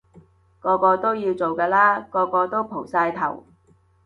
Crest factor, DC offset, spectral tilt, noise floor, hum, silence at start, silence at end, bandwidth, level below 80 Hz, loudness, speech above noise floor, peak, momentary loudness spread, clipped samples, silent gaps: 18 dB; under 0.1%; -7.5 dB/octave; -59 dBFS; none; 0.65 s; 0.65 s; 7.2 kHz; -62 dBFS; -21 LUFS; 38 dB; -4 dBFS; 10 LU; under 0.1%; none